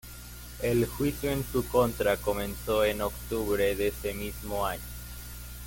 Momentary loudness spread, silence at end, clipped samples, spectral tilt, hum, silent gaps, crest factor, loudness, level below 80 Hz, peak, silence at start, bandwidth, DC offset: 15 LU; 0 s; under 0.1%; -5 dB/octave; 60 Hz at -40 dBFS; none; 18 dB; -29 LUFS; -42 dBFS; -10 dBFS; 0.05 s; 17 kHz; under 0.1%